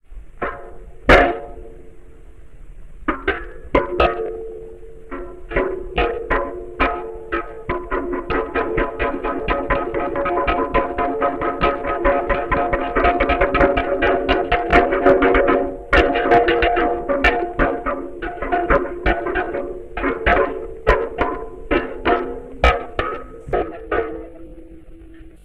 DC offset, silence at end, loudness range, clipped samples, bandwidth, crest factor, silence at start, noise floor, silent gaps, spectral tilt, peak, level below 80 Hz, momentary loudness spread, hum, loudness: 0.9%; 0.1 s; 8 LU; under 0.1%; 10.5 kHz; 20 dB; 0 s; -42 dBFS; none; -7 dB/octave; 0 dBFS; -30 dBFS; 14 LU; none; -19 LUFS